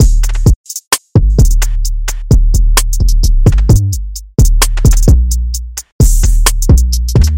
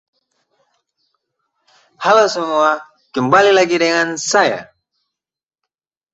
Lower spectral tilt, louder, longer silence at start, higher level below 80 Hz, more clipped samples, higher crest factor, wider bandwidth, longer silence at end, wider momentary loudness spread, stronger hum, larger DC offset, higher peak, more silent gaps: first, -5 dB/octave vs -3 dB/octave; about the same, -12 LUFS vs -14 LUFS; second, 0 s vs 2 s; first, -10 dBFS vs -62 dBFS; neither; second, 8 dB vs 18 dB; first, 17 kHz vs 8.2 kHz; second, 0 s vs 1.5 s; second, 8 LU vs 11 LU; neither; neither; about the same, 0 dBFS vs 0 dBFS; first, 0.56-0.64 s, 0.87-0.91 s, 5.92-5.99 s vs none